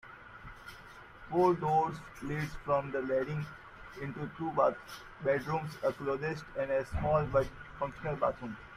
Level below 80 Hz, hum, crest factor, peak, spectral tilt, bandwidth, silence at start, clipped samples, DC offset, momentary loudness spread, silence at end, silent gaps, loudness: -54 dBFS; none; 20 dB; -14 dBFS; -7.5 dB/octave; 15 kHz; 0.05 s; under 0.1%; under 0.1%; 20 LU; 0 s; none; -33 LUFS